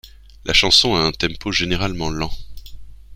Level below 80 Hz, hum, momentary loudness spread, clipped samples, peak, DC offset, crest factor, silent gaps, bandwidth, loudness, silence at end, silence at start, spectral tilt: -34 dBFS; none; 16 LU; under 0.1%; 0 dBFS; under 0.1%; 20 dB; none; 16 kHz; -17 LUFS; 0 s; 0.05 s; -3 dB/octave